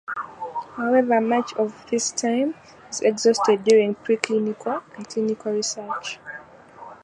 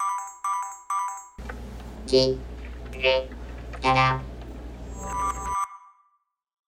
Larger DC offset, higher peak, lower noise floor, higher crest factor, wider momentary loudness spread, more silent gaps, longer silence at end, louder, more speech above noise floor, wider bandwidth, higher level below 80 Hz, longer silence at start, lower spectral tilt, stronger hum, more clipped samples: neither; first, -2 dBFS vs -8 dBFS; second, -44 dBFS vs -70 dBFS; about the same, 20 dB vs 20 dB; second, 14 LU vs 18 LU; neither; second, 0.1 s vs 0.8 s; first, -23 LUFS vs -26 LUFS; second, 22 dB vs 48 dB; second, 11 kHz vs 16 kHz; second, -68 dBFS vs -40 dBFS; about the same, 0.1 s vs 0 s; about the same, -3.5 dB/octave vs -4.5 dB/octave; neither; neither